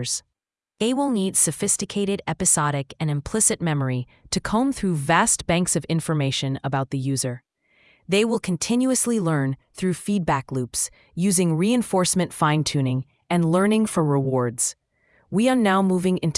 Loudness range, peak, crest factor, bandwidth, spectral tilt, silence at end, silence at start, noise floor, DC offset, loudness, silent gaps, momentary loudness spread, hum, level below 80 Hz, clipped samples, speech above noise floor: 2 LU; -4 dBFS; 18 dB; 12 kHz; -4.5 dB/octave; 0 s; 0 s; -82 dBFS; under 0.1%; -22 LUFS; none; 8 LU; none; -52 dBFS; under 0.1%; 60 dB